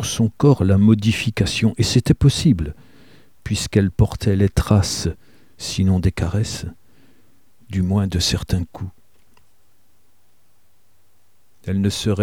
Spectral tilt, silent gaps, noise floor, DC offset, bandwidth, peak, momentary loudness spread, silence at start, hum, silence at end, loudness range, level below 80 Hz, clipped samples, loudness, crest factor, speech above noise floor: -6 dB/octave; none; -63 dBFS; 0.5%; 16 kHz; -2 dBFS; 15 LU; 0 s; none; 0 s; 10 LU; -34 dBFS; under 0.1%; -19 LUFS; 18 dB; 45 dB